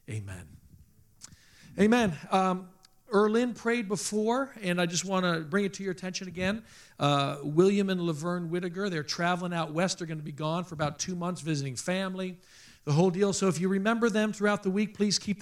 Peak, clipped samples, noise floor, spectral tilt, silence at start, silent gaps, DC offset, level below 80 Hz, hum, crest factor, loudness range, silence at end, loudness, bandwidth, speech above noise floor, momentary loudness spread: -10 dBFS; under 0.1%; -58 dBFS; -5 dB/octave; 0.1 s; none; under 0.1%; -64 dBFS; none; 20 dB; 3 LU; 0 s; -29 LUFS; 14 kHz; 29 dB; 10 LU